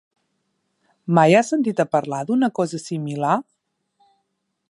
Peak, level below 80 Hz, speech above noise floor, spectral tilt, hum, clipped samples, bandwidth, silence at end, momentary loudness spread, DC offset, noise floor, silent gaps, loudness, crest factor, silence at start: -2 dBFS; -74 dBFS; 55 dB; -6.5 dB/octave; none; under 0.1%; 11.5 kHz; 1.3 s; 11 LU; under 0.1%; -74 dBFS; none; -20 LUFS; 20 dB; 1.05 s